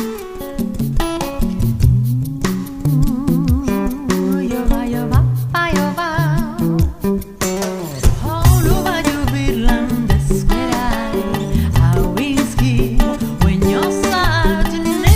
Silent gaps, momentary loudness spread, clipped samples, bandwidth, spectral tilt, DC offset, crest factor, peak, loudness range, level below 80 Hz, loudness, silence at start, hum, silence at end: none; 6 LU; under 0.1%; 16 kHz; -6 dB/octave; under 0.1%; 16 dB; 0 dBFS; 2 LU; -22 dBFS; -17 LUFS; 0 s; none; 0 s